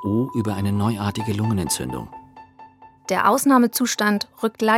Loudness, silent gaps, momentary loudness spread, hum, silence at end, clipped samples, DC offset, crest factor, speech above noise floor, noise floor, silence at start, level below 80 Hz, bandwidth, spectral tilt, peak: -21 LUFS; none; 11 LU; none; 0 s; under 0.1%; under 0.1%; 18 dB; 26 dB; -47 dBFS; 0 s; -54 dBFS; 16.5 kHz; -5 dB/octave; -4 dBFS